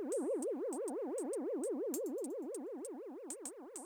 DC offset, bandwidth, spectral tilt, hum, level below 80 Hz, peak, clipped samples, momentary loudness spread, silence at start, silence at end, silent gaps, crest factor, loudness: under 0.1%; over 20 kHz; -3.5 dB/octave; none; under -90 dBFS; -26 dBFS; under 0.1%; 8 LU; 0 s; 0 s; none; 16 dB; -41 LUFS